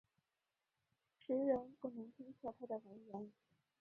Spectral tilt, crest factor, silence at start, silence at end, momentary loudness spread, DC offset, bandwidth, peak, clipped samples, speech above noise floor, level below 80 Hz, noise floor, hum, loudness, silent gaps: -7.5 dB/octave; 22 dB; 1.3 s; 0.5 s; 17 LU; under 0.1%; 4.2 kHz; -26 dBFS; under 0.1%; over 45 dB; -84 dBFS; under -90 dBFS; none; -45 LUFS; none